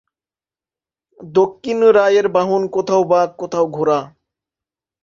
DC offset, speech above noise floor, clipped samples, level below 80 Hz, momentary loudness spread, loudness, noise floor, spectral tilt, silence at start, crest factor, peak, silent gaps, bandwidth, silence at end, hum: under 0.1%; over 75 dB; under 0.1%; -62 dBFS; 7 LU; -16 LUFS; under -90 dBFS; -6 dB/octave; 1.2 s; 16 dB; -2 dBFS; none; 7.4 kHz; 0.95 s; none